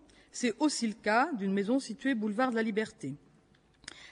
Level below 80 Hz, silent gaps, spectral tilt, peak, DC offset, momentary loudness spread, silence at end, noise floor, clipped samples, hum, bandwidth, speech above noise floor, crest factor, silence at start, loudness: -72 dBFS; none; -4.5 dB/octave; -14 dBFS; under 0.1%; 18 LU; 0 s; -65 dBFS; under 0.1%; none; 11 kHz; 34 dB; 18 dB; 0.35 s; -31 LUFS